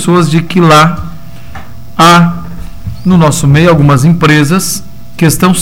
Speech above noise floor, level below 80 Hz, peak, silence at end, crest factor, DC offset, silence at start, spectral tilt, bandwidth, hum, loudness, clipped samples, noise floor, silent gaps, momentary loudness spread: 22 dB; -30 dBFS; 0 dBFS; 0 s; 8 dB; 6%; 0 s; -5.5 dB/octave; 16.5 kHz; none; -7 LUFS; 0.7%; -28 dBFS; none; 18 LU